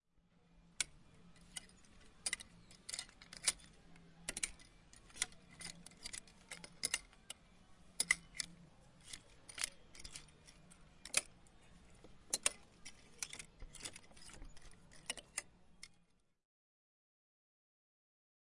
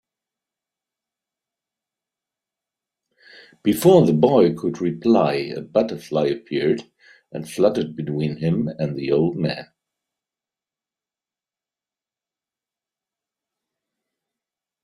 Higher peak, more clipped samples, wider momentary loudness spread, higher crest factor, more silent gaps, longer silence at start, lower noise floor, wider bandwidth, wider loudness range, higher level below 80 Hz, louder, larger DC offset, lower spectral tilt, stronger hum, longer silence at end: second, -14 dBFS vs -2 dBFS; neither; first, 25 LU vs 12 LU; first, 34 dB vs 22 dB; neither; second, 0.4 s vs 3.65 s; second, -74 dBFS vs under -90 dBFS; second, 11.5 kHz vs 16 kHz; about the same, 9 LU vs 9 LU; about the same, -66 dBFS vs -62 dBFS; second, -43 LUFS vs -20 LUFS; neither; second, 0.5 dB/octave vs -7 dB/octave; neither; second, 2.45 s vs 5.2 s